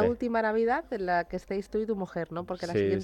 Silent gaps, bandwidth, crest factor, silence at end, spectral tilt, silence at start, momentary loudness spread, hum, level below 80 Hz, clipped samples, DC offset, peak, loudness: none; 17 kHz; 16 dB; 0 s; -7 dB/octave; 0 s; 8 LU; none; -56 dBFS; under 0.1%; under 0.1%; -12 dBFS; -30 LUFS